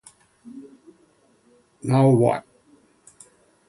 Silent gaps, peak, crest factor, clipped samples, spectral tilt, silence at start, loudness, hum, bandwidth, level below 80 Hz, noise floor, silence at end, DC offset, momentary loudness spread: none; -4 dBFS; 20 dB; under 0.1%; -8.5 dB/octave; 0.45 s; -20 LUFS; none; 11.5 kHz; -64 dBFS; -60 dBFS; 1.3 s; under 0.1%; 27 LU